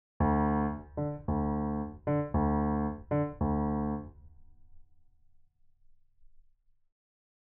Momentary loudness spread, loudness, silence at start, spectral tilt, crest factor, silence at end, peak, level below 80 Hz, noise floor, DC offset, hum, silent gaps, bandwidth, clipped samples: 8 LU; -32 LUFS; 0.2 s; -10.5 dB/octave; 16 dB; 1.25 s; -18 dBFS; -44 dBFS; -65 dBFS; under 0.1%; none; none; 3.2 kHz; under 0.1%